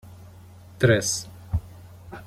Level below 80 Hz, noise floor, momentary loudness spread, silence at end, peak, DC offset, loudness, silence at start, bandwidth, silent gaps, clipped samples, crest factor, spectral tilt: -44 dBFS; -46 dBFS; 25 LU; 0 s; -4 dBFS; under 0.1%; -24 LUFS; 0.05 s; 16 kHz; none; under 0.1%; 22 dB; -4.5 dB/octave